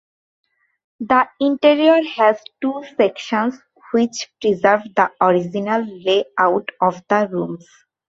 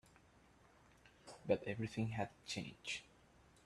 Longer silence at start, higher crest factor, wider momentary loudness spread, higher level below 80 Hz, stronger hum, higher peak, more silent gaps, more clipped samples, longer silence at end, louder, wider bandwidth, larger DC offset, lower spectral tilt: about the same, 1 s vs 1.05 s; second, 18 dB vs 24 dB; second, 9 LU vs 15 LU; first, -64 dBFS vs -72 dBFS; neither; first, -2 dBFS vs -22 dBFS; neither; neither; about the same, 0.6 s vs 0.6 s; first, -18 LUFS vs -44 LUFS; second, 7.8 kHz vs 12.5 kHz; neither; about the same, -5 dB/octave vs -5 dB/octave